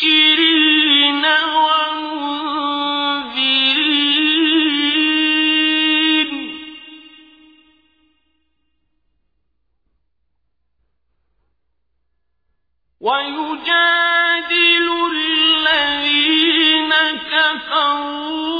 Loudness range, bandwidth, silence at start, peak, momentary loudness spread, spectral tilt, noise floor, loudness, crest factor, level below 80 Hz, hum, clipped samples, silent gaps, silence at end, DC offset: 9 LU; 5 kHz; 0 s; -2 dBFS; 10 LU; -3 dB/octave; -73 dBFS; -14 LUFS; 16 dB; -60 dBFS; none; under 0.1%; none; 0 s; under 0.1%